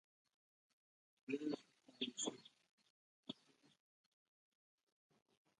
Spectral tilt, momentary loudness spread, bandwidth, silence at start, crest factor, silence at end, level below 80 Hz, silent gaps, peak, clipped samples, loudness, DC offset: -2.5 dB/octave; 18 LU; 11 kHz; 1.3 s; 24 dB; 2.25 s; under -90 dBFS; 2.71-2.78 s, 2.90-3.23 s; -30 dBFS; under 0.1%; -48 LUFS; under 0.1%